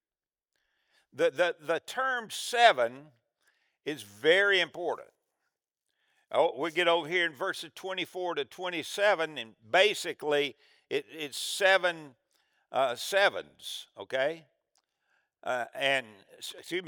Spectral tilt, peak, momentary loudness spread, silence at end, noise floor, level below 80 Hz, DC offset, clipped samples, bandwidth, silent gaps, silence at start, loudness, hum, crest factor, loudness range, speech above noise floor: -2 dB/octave; -6 dBFS; 16 LU; 0 s; under -90 dBFS; -90 dBFS; under 0.1%; under 0.1%; over 20 kHz; none; 1.15 s; -29 LUFS; none; 26 dB; 4 LU; over 60 dB